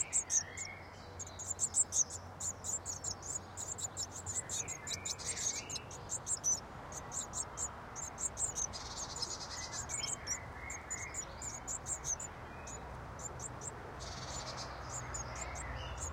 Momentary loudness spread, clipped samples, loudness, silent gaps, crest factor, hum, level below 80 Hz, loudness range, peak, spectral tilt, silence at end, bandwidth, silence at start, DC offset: 12 LU; under 0.1%; -39 LUFS; none; 22 dB; none; -56 dBFS; 6 LU; -18 dBFS; -1.5 dB/octave; 0 s; 16.5 kHz; 0 s; under 0.1%